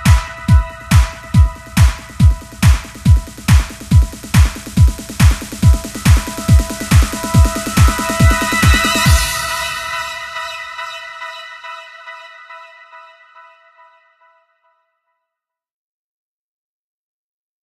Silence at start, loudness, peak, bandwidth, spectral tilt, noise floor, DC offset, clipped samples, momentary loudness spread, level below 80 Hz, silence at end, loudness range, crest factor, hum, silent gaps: 0 s; -14 LUFS; 0 dBFS; 14 kHz; -5 dB/octave; -82 dBFS; under 0.1%; under 0.1%; 17 LU; -18 dBFS; 4.7 s; 16 LU; 14 dB; none; none